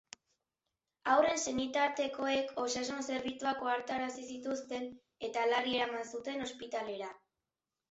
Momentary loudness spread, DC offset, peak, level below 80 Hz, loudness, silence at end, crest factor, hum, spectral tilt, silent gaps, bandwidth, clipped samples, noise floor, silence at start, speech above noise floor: 11 LU; under 0.1%; -16 dBFS; -72 dBFS; -35 LUFS; 0.75 s; 22 dB; none; -1 dB/octave; none; 8 kHz; under 0.1%; under -90 dBFS; 1.05 s; over 55 dB